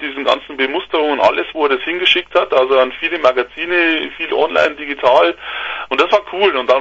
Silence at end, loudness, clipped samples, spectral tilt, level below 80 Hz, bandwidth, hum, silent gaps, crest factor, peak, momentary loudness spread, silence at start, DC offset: 0 s; -15 LUFS; under 0.1%; -3.5 dB/octave; -52 dBFS; 7.8 kHz; none; none; 16 dB; 0 dBFS; 6 LU; 0 s; under 0.1%